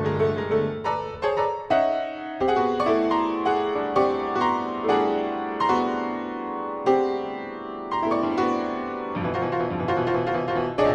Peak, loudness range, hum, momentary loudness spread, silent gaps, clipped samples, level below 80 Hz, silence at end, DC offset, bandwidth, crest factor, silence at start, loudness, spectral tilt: -8 dBFS; 3 LU; none; 7 LU; none; under 0.1%; -54 dBFS; 0 s; under 0.1%; 8.8 kHz; 16 dB; 0 s; -25 LUFS; -7 dB/octave